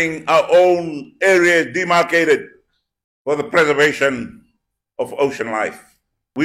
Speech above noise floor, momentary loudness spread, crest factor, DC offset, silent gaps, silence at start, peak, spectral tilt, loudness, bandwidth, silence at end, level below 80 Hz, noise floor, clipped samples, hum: 53 dB; 15 LU; 14 dB; under 0.1%; 3.04-3.25 s; 0 s; -4 dBFS; -4 dB/octave; -16 LUFS; 15.5 kHz; 0 s; -58 dBFS; -69 dBFS; under 0.1%; none